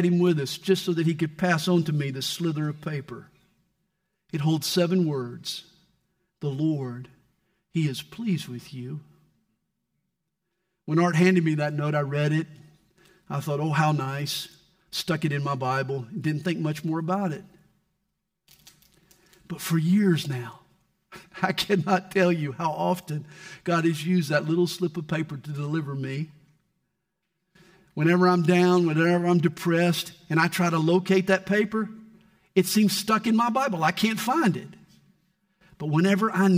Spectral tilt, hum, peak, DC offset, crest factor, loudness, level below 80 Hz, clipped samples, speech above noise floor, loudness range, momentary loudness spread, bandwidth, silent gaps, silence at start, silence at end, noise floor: -6 dB/octave; none; -8 dBFS; under 0.1%; 18 dB; -25 LUFS; -68 dBFS; under 0.1%; 56 dB; 9 LU; 14 LU; 16 kHz; none; 0 s; 0 s; -81 dBFS